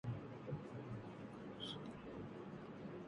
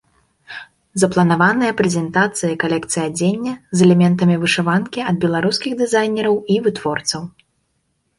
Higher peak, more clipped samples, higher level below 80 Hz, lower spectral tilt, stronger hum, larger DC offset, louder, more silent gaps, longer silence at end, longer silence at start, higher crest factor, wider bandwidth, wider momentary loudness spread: second, -34 dBFS vs -2 dBFS; neither; second, -72 dBFS vs -56 dBFS; first, -7 dB/octave vs -5 dB/octave; neither; neither; second, -51 LUFS vs -17 LUFS; neither; second, 0 s vs 0.9 s; second, 0.05 s vs 0.5 s; about the same, 16 dB vs 16 dB; about the same, 11 kHz vs 11.5 kHz; second, 4 LU vs 11 LU